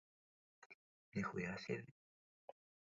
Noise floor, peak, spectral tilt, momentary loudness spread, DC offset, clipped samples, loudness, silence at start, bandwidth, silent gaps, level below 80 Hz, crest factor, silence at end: under -90 dBFS; -30 dBFS; -5.5 dB/octave; 21 LU; under 0.1%; under 0.1%; -46 LUFS; 0.6 s; 7.4 kHz; 0.66-1.12 s; -76 dBFS; 22 dB; 1.05 s